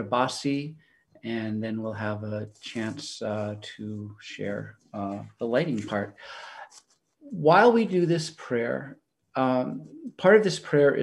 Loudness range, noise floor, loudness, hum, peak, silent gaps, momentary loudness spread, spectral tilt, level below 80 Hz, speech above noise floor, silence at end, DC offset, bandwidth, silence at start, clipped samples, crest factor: 9 LU; -57 dBFS; -26 LUFS; none; -6 dBFS; none; 20 LU; -6 dB/octave; -72 dBFS; 32 dB; 0 s; under 0.1%; 11.5 kHz; 0 s; under 0.1%; 22 dB